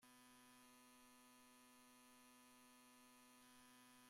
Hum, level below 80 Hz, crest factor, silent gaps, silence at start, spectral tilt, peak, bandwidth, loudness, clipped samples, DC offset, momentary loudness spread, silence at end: none; under -90 dBFS; 12 dB; none; 0 s; -1.5 dB/octave; -56 dBFS; 16 kHz; -68 LUFS; under 0.1%; under 0.1%; 1 LU; 0 s